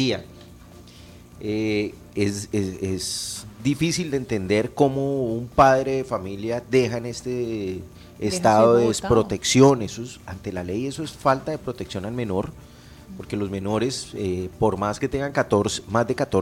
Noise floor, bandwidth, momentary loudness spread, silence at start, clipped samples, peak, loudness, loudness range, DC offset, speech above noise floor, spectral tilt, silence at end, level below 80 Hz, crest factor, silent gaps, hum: -45 dBFS; 16.5 kHz; 14 LU; 0 s; under 0.1%; -2 dBFS; -23 LUFS; 7 LU; under 0.1%; 23 dB; -5 dB/octave; 0 s; -48 dBFS; 20 dB; none; none